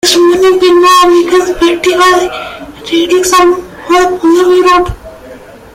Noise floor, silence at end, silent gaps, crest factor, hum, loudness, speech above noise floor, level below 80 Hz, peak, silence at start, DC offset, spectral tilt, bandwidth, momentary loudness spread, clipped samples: -31 dBFS; 0.3 s; none; 8 dB; none; -7 LUFS; 23 dB; -34 dBFS; 0 dBFS; 0.05 s; under 0.1%; -3 dB/octave; 16 kHz; 12 LU; under 0.1%